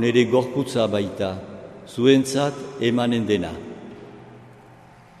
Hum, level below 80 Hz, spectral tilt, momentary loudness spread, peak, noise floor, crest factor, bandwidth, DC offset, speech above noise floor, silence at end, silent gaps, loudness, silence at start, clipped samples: none; -58 dBFS; -5.5 dB/octave; 21 LU; -4 dBFS; -48 dBFS; 20 dB; 13.5 kHz; under 0.1%; 27 dB; 0.7 s; none; -22 LUFS; 0 s; under 0.1%